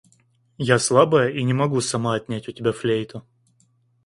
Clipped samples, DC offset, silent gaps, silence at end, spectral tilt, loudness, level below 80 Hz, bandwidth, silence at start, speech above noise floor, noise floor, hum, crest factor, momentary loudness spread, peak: under 0.1%; under 0.1%; none; 0.85 s; -5 dB/octave; -21 LUFS; -58 dBFS; 11.5 kHz; 0.6 s; 42 dB; -63 dBFS; none; 22 dB; 13 LU; 0 dBFS